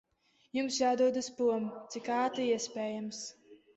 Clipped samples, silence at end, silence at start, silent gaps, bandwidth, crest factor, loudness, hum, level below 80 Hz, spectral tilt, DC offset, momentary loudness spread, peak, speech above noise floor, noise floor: under 0.1%; 0.2 s; 0.55 s; none; 8.2 kHz; 16 dB; -33 LUFS; none; -76 dBFS; -3.5 dB/octave; under 0.1%; 12 LU; -18 dBFS; 39 dB; -71 dBFS